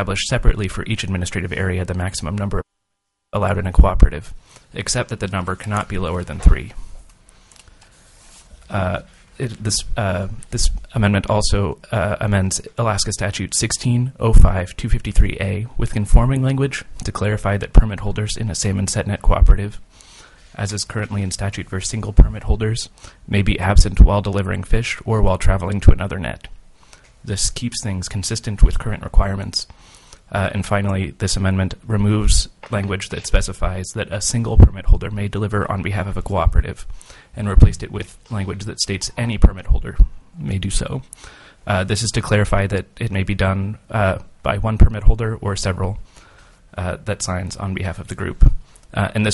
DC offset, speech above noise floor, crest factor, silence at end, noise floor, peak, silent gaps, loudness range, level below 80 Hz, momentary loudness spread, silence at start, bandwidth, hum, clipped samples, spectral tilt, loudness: under 0.1%; 58 dB; 18 dB; 0 s; -75 dBFS; 0 dBFS; none; 5 LU; -20 dBFS; 11 LU; 0 s; 11.5 kHz; none; under 0.1%; -5 dB/octave; -20 LUFS